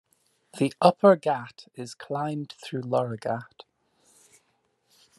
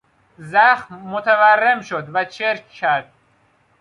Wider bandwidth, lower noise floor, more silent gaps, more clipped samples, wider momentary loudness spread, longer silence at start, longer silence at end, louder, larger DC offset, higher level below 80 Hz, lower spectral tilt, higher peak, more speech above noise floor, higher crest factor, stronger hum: first, 12.5 kHz vs 11 kHz; first, -71 dBFS vs -59 dBFS; neither; neither; first, 21 LU vs 10 LU; first, 0.55 s vs 0.4 s; first, 1.75 s vs 0.8 s; second, -25 LUFS vs -17 LUFS; neither; second, -76 dBFS vs -68 dBFS; first, -6.5 dB/octave vs -4.5 dB/octave; about the same, -2 dBFS vs -2 dBFS; first, 46 dB vs 41 dB; first, 24 dB vs 16 dB; neither